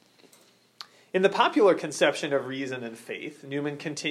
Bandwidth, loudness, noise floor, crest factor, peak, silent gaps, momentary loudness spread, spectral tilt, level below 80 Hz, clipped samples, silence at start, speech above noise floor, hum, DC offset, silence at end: 13.5 kHz; -26 LUFS; -60 dBFS; 22 dB; -6 dBFS; none; 15 LU; -4 dB/octave; -84 dBFS; under 0.1%; 0.8 s; 34 dB; none; under 0.1%; 0 s